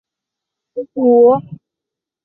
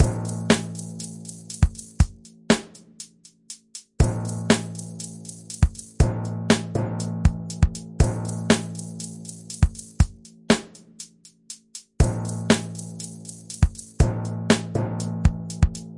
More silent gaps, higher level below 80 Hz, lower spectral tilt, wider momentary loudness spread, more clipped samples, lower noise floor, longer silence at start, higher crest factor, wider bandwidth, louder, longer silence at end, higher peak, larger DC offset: neither; second, -64 dBFS vs -30 dBFS; first, -13.5 dB/octave vs -5.5 dB/octave; about the same, 19 LU vs 18 LU; neither; first, -84 dBFS vs -46 dBFS; first, 0.75 s vs 0 s; second, 14 dB vs 22 dB; second, 1.5 kHz vs 11.5 kHz; first, -12 LUFS vs -25 LUFS; first, 0.7 s vs 0 s; about the same, -2 dBFS vs -2 dBFS; neither